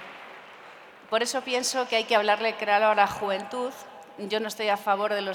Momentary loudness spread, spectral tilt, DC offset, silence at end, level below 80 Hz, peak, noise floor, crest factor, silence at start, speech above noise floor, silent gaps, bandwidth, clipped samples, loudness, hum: 22 LU; -2 dB/octave; under 0.1%; 0 s; -70 dBFS; -6 dBFS; -48 dBFS; 20 dB; 0 s; 22 dB; none; 19 kHz; under 0.1%; -25 LUFS; none